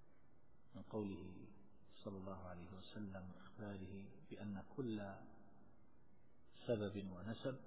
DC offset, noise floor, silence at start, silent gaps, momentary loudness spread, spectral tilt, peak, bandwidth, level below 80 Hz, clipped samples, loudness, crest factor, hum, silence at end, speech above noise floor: 0.1%; -73 dBFS; 0 s; none; 17 LU; -6.5 dB/octave; -28 dBFS; 4 kHz; -72 dBFS; under 0.1%; -50 LUFS; 22 dB; none; 0 s; 24 dB